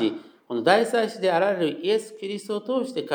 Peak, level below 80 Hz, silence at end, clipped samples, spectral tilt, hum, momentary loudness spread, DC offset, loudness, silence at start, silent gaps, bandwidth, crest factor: -4 dBFS; -88 dBFS; 0 s; under 0.1%; -4.5 dB/octave; none; 12 LU; under 0.1%; -24 LUFS; 0 s; none; over 20 kHz; 20 dB